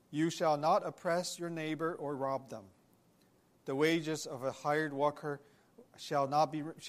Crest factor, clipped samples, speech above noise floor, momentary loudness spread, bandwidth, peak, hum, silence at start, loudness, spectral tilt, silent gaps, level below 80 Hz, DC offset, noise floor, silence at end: 18 dB; under 0.1%; 34 dB; 12 LU; 15 kHz; -18 dBFS; none; 0.1 s; -35 LUFS; -5 dB/octave; none; -80 dBFS; under 0.1%; -69 dBFS; 0 s